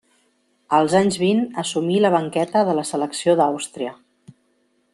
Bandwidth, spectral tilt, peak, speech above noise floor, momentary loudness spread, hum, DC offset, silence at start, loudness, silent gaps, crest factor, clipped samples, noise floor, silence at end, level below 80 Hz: 12.5 kHz; -5 dB/octave; -4 dBFS; 46 dB; 9 LU; none; under 0.1%; 0.7 s; -20 LUFS; none; 18 dB; under 0.1%; -65 dBFS; 1 s; -64 dBFS